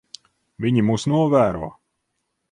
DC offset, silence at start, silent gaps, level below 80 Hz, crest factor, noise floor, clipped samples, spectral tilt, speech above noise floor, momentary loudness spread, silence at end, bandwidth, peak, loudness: under 0.1%; 0.6 s; none; -50 dBFS; 18 dB; -75 dBFS; under 0.1%; -7 dB/octave; 57 dB; 13 LU; 0.8 s; 11 kHz; -4 dBFS; -20 LUFS